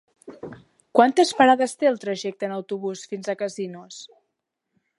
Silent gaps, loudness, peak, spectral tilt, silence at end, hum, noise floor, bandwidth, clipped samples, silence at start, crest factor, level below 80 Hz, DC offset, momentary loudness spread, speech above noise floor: none; -22 LUFS; -2 dBFS; -4 dB/octave; 0.9 s; none; -79 dBFS; 11.5 kHz; under 0.1%; 0.25 s; 22 dB; -74 dBFS; under 0.1%; 23 LU; 58 dB